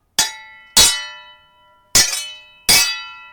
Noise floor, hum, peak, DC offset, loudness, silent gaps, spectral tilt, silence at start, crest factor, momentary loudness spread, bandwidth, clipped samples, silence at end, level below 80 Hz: -53 dBFS; none; 0 dBFS; under 0.1%; -14 LUFS; none; 1 dB/octave; 0.2 s; 18 dB; 15 LU; 19.5 kHz; under 0.1%; 0.1 s; -42 dBFS